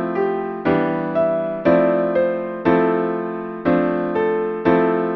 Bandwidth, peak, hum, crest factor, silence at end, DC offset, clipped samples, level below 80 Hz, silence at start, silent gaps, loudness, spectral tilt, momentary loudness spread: 5.8 kHz; -2 dBFS; none; 18 dB; 0 s; under 0.1%; under 0.1%; -52 dBFS; 0 s; none; -19 LUFS; -9.5 dB/octave; 6 LU